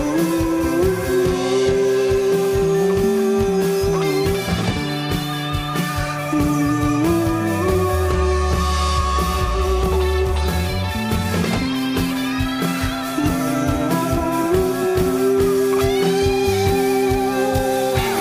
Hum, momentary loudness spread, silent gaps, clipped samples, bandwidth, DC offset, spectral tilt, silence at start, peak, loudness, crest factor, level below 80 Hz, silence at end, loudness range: none; 4 LU; none; under 0.1%; 15.5 kHz; under 0.1%; -5.5 dB/octave; 0 s; -6 dBFS; -19 LUFS; 12 dB; -28 dBFS; 0 s; 3 LU